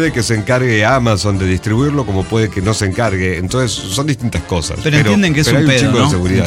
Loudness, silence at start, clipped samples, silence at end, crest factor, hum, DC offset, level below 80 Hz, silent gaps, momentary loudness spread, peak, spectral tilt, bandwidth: -14 LUFS; 0 s; under 0.1%; 0 s; 12 dB; none; 0.2%; -32 dBFS; none; 6 LU; 0 dBFS; -5 dB/octave; 15.5 kHz